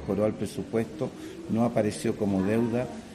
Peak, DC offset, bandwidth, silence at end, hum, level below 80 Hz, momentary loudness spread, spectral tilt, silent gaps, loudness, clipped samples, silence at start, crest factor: -12 dBFS; under 0.1%; 14 kHz; 0 s; none; -56 dBFS; 9 LU; -7 dB/octave; none; -28 LUFS; under 0.1%; 0 s; 16 dB